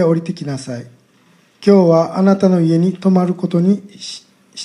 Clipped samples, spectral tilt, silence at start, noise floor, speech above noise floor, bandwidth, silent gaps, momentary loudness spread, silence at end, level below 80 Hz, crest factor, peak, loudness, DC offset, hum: under 0.1%; -8 dB/octave; 0 s; -52 dBFS; 38 dB; 10.5 kHz; none; 18 LU; 0 s; -64 dBFS; 16 dB; 0 dBFS; -14 LUFS; under 0.1%; none